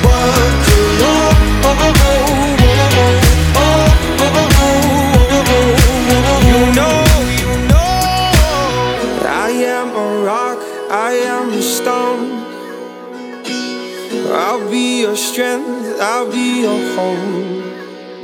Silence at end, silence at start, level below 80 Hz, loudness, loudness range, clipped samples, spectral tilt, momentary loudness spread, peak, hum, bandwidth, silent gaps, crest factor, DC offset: 0 s; 0 s; -18 dBFS; -13 LUFS; 8 LU; under 0.1%; -5 dB/octave; 12 LU; 0 dBFS; none; 19 kHz; none; 12 dB; under 0.1%